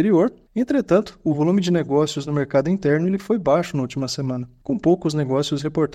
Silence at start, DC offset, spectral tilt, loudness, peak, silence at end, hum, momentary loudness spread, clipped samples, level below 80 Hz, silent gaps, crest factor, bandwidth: 0 s; under 0.1%; -6.5 dB/octave; -21 LUFS; -4 dBFS; 0 s; none; 7 LU; under 0.1%; -52 dBFS; none; 16 dB; 13.5 kHz